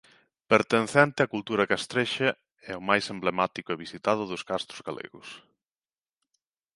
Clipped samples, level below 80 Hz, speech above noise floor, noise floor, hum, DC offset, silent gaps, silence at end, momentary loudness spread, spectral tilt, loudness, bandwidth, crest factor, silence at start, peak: under 0.1%; -68 dBFS; over 63 dB; under -90 dBFS; none; under 0.1%; none; 1.35 s; 17 LU; -4.5 dB/octave; -27 LUFS; 11.5 kHz; 24 dB; 0.5 s; -4 dBFS